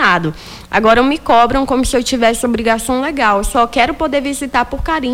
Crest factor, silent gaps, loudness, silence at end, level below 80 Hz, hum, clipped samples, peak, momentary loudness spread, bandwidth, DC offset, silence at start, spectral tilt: 12 dB; none; -14 LUFS; 0 s; -30 dBFS; none; under 0.1%; -2 dBFS; 6 LU; 18.5 kHz; under 0.1%; 0 s; -4 dB/octave